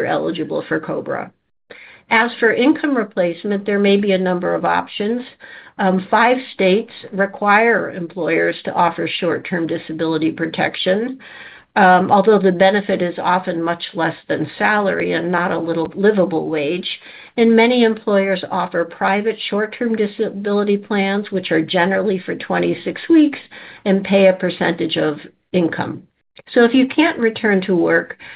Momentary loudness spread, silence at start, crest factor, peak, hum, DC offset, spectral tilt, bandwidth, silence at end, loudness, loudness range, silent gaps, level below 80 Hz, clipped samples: 10 LU; 0 s; 16 dB; 0 dBFS; none; under 0.1%; -10 dB/octave; 5 kHz; 0 s; -17 LUFS; 3 LU; none; -62 dBFS; under 0.1%